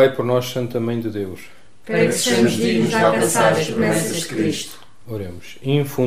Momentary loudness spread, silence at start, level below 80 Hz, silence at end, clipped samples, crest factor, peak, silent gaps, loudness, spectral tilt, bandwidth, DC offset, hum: 14 LU; 0 s; -56 dBFS; 0 s; under 0.1%; 18 dB; -2 dBFS; none; -19 LUFS; -4.5 dB/octave; 16 kHz; 1%; none